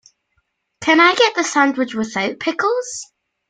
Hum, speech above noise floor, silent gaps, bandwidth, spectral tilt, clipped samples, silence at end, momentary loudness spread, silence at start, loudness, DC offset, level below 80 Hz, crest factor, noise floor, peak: none; 52 dB; none; 9.4 kHz; -2.5 dB/octave; under 0.1%; 0.45 s; 11 LU; 0.8 s; -16 LUFS; under 0.1%; -64 dBFS; 18 dB; -69 dBFS; 0 dBFS